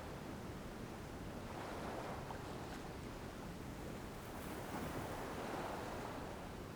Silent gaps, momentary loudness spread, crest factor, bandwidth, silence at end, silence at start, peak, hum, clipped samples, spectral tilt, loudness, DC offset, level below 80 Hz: none; 5 LU; 14 dB; over 20 kHz; 0 s; 0 s; -32 dBFS; none; under 0.1%; -5.5 dB/octave; -48 LUFS; under 0.1%; -58 dBFS